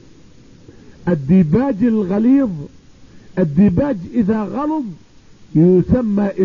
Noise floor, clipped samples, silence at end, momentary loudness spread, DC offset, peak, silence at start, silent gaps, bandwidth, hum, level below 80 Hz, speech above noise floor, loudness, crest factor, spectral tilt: -45 dBFS; under 0.1%; 0 s; 12 LU; 0.4%; -4 dBFS; 1.05 s; none; 6.8 kHz; none; -40 dBFS; 30 dB; -16 LUFS; 14 dB; -10.5 dB/octave